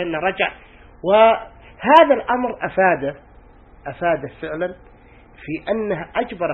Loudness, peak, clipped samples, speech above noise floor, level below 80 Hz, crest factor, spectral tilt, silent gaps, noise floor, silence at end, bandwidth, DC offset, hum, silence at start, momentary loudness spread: -19 LUFS; 0 dBFS; under 0.1%; 28 dB; -48 dBFS; 20 dB; -7 dB/octave; none; -46 dBFS; 0 s; 5.2 kHz; under 0.1%; none; 0 s; 16 LU